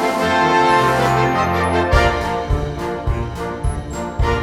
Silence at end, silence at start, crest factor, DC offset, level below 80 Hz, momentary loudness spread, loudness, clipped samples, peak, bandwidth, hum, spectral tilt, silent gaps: 0 s; 0 s; 16 dB; under 0.1%; -26 dBFS; 10 LU; -17 LUFS; under 0.1%; -2 dBFS; 16 kHz; none; -5.5 dB/octave; none